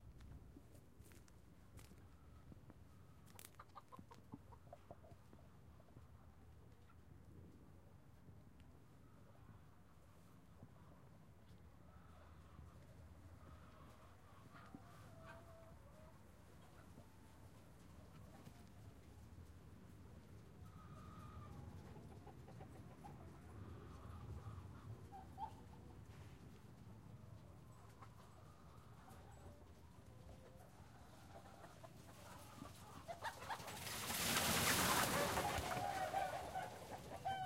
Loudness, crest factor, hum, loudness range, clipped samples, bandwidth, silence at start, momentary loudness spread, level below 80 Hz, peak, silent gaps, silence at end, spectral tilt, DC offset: -46 LUFS; 30 dB; none; 24 LU; under 0.1%; 16 kHz; 0 s; 22 LU; -66 dBFS; -22 dBFS; none; 0 s; -3 dB/octave; under 0.1%